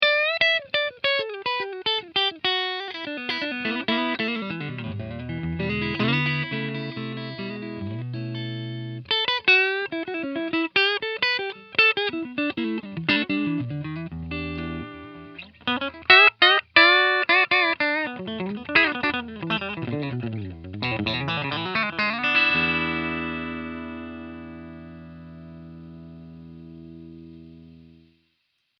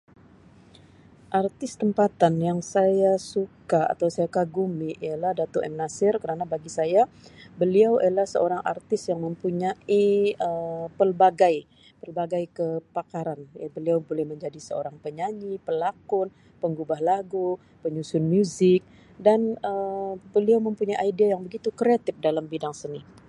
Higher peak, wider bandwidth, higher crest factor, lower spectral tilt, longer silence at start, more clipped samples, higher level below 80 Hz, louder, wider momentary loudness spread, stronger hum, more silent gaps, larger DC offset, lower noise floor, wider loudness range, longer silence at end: first, 0 dBFS vs -6 dBFS; second, 6.6 kHz vs 11 kHz; first, 26 dB vs 20 dB; about the same, -6 dB/octave vs -6.5 dB/octave; second, 0 s vs 1.3 s; neither; first, -54 dBFS vs -66 dBFS; first, -22 LUFS vs -25 LUFS; first, 23 LU vs 12 LU; neither; neither; neither; first, -73 dBFS vs -53 dBFS; first, 11 LU vs 6 LU; first, 0.9 s vs 0.25 s